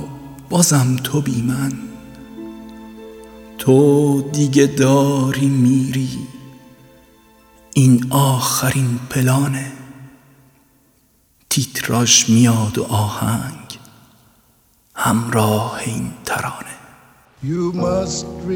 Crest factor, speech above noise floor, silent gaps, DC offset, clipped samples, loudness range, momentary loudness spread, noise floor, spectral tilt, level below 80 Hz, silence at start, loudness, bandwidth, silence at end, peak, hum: 18 dB; 41 dB; none; under 0.1%; under 0.1%; 6 LU; 22 LU; -57 dBFS; -5 dB/octave; -48 dBFS; 0 s; -16 LUFS; 19.5 kHz; 0 s; 0 dBFS; none